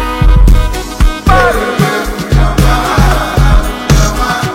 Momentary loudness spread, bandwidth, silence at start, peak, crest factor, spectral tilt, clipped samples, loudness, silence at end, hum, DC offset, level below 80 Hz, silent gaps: 4 LU; 16 kHz; 0 s; 0 dBFS; 8 dB; -5.5 dB/octave; 1%; -11 LUFS; 0 s; none; under 0.1%; -10 dBFS; none